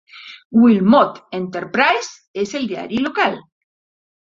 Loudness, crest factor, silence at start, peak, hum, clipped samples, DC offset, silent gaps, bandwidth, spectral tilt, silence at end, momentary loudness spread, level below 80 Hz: -17 LUFS; 16 dB; 0.15 s; -2 dBFS; none; under 0.1%; under 0.1%; 0.45-0.50 s, 2.28-2.34 s; 7.6 kHz; -5.5 dB/octave; 0.95 s; 16 LU; -60 dBFS